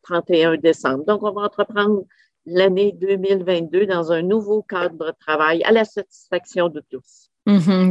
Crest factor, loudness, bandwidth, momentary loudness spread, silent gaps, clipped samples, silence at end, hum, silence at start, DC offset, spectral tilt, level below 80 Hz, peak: 16 dB; -19 LUFS; 8.8 kHz; 10 LU; none; under 0.1%; 0 s; none; 0.05 s; under 0.1%; -6.5 dB/octave; -66 dBFS; -2 dBFS